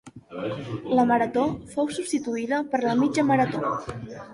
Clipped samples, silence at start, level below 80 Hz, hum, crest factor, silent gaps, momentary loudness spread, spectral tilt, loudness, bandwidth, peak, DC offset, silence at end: under 0.1%; 0.05 s; -58 dBFS; none; 16 dB; none; 12 LU; -6 dB/octave; -25 LUFS; 11.5 kHz; -8 dBFS; under 0.1%; 0 s